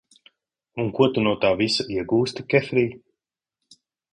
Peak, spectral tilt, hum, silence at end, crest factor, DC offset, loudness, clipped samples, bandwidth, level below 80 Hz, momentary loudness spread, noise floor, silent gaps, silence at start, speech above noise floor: -4 dBFS; -5.5 dB/octave; none; 1.15 s; 20 dB; under 0.1%; -22 LUFS; under 0.1%; 10.5 kHz; -56 dBFS; 8 LU; -86 dBFS; none; 0.75 s; 64 dB